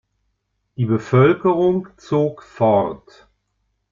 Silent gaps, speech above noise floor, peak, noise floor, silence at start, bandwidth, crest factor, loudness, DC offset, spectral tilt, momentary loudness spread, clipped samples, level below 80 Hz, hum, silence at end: none; 54 dB; -2 dBFS; -71 dBFS; 0.8 s; 7.4 kHz; 18 dB; -18 LUFS; under 0.1%; -9 dB/octave; 11 LU; under 0.1%; -54 dBFS; 50 Hz at -50 dBFS; 0.95 s